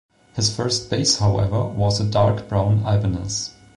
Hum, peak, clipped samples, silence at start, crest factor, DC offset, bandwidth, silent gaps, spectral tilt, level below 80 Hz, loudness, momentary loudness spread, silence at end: none; -6 dBFS; under 0.1%; 0.35 s; 14 dB; under 0.1%; 11 kHz; none; -5 dB/octave; -40 dBFS; -20 LUFS; 6 LU; 0.25 s